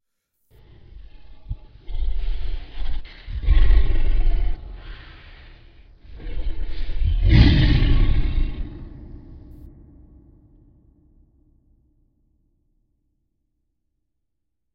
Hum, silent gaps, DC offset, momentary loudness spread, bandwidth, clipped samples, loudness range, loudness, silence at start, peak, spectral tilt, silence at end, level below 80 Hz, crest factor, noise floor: none; none; under 0.1%; 25 LU; 5.4 kHz; under 0.1%; 14 LU; -23 LUFS; 0.95 s; 0 dBFS; -8.5 dB/octave; 5.4 s; -22 dBFS; 20 dB; -80 dBFS